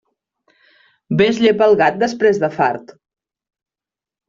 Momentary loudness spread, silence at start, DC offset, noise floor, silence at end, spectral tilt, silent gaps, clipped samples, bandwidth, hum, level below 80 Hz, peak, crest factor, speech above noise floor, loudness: 7 LU; 1.1 s; under 0.1%; -89 dBFS; 1.45 s; -6 dB/octave; none; under 0.1%; 7.4 kHz; none; -58 dBFS; -2 dBFS; 16 dB; 75 dB; -15 LUFS